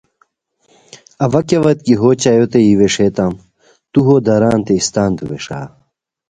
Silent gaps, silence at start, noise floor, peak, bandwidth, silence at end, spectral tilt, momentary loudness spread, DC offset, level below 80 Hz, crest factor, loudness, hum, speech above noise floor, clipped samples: none; 1.2 s; -62 dBFS; 0 dBFS; 9.6 kHz; 0.6 s; -6 dB/octave; 13 LU; under 0.1%; -44 dBFS; 14 dB; -13 LUFS; none; 50 dB; under 0.1%